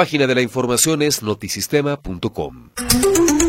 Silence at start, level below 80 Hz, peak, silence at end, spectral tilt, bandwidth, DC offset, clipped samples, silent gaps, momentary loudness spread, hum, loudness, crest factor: 0 s; -38 dBFS; 0 dBFS; 0 s; -3.5 dB/octave; 16.5 kHz; under 0.1%; under 0.1%; none; 11 LU; none; -17 LUFS; 18 dB